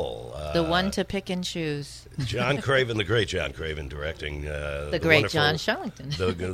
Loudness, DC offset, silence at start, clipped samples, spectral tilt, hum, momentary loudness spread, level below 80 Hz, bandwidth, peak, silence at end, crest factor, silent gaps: -26 LUFS; under 0.1%; 0 s; under 0.1%; -5 dB/octave; none; 13 LU; -42 dBFS; 15.5 kHz; -4 dBFS; 0 s; 22 dB; none